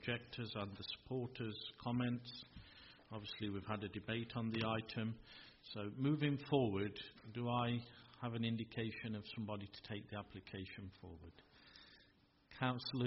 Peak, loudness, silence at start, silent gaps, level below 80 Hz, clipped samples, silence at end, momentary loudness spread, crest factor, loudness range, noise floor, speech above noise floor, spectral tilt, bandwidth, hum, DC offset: -22 dBFS; -44 LUFS; 0 s; none; -70 dBFS; under 0.1%; 0 s; 19 LU; 22 dB; 8 LU; -72 dBFS; 29 dB; -5 dB/octave; 5.8 kHz; none; under 0.1%